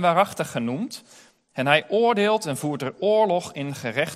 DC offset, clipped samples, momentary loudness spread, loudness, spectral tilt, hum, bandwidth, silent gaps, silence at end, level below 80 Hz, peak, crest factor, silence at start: under 0.1%; under 0.1%; 11 LU; -23 LUFS; -5 dB/octave; none; 15.5 kHz; none; 0 s; -70 dBFS; -2 dBFS; 22 dB; 0 s